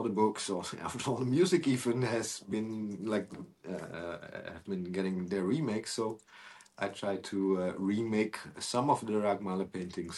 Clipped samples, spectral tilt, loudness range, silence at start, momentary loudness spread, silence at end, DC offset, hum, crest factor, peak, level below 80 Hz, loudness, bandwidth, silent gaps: under 0.1%; -5.5 dB/octave; 4 LU; 0 s; 13 LU; 0 s; under 0.1%; none; 20 dB; -14 dBFS; -70 dBFS; -34 LUFS; 12.5 kHz; none